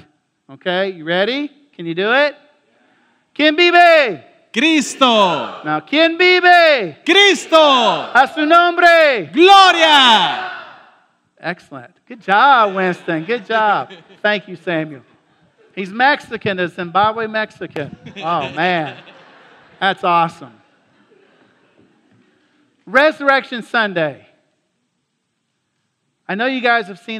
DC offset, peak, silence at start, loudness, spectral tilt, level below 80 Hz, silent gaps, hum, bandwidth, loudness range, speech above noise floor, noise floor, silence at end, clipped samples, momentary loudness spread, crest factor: under 0.1%; 0 dBFS; 0.5 s; -13 LUFS; -3.5 dB/octave; -66 dBFS; none; none; 15 kHz; 11 LU; 56 dB; -70 dBFS; 0 s; under 0.1%; 18 LU; 16 dB